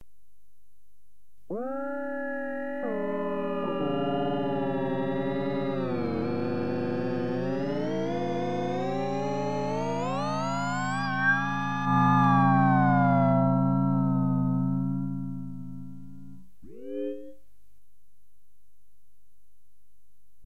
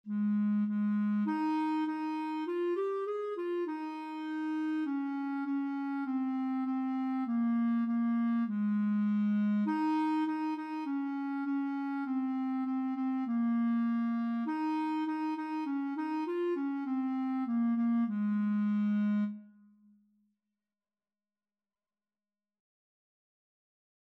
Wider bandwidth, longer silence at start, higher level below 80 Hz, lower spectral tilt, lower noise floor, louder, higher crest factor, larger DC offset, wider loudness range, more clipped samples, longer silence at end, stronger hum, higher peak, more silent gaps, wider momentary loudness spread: first, 8.4 kHz vs 5.6 kHz; first, 1.5 s vs 0.05 s; first, -58 dBFS vs under -90 dBFS; second, -7.5 dB/octave vs -9 dB/octave; second, -72 dBFS vs under -90 dBFS; first, -27 LUFS vs -33 LUFS; first, 18 dB vs 10 dB; first, 1% vs under 0.1%; first, 18 LU vs 4 LU; neither; second, 3.15 s vs 4.6 s; neither; first, -10 dBFS vs -22 dBFS; neither; first, 13 LU vs 5 LU